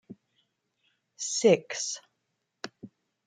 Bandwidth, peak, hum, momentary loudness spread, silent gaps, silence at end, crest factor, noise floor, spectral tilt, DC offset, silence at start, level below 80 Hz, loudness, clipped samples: 9.6 kHz; -8 dBFS; none; 20 LU; none; 0.4 s; 24 dB; -80 dBFS; -3.5 dB/octave; under 0.1%; 0.1 s; -80 dBFS; -27 LUFS; under 0.1%